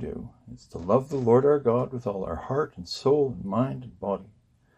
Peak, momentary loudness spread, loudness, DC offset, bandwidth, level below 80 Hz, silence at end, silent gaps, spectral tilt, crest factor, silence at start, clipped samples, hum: -6 dBFS; 16 LU; -26 LUFS; under 0.1%; 8.8 kHz; -54 dBFS; 0.5 s; none; -7.5 dB/octave; 20 dB; 0 s; under 0.1%; none